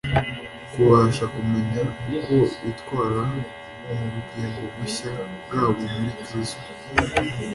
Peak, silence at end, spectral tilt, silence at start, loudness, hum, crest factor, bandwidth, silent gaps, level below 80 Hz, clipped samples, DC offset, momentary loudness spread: -4 dBFS; 0 s; -6.5 dB/octave; 0.05 s; -24 LUFS; none; 20 dB; 11.5 kHz; none; -44 dBFS; under 0.1%; under 0.1%; 12 LU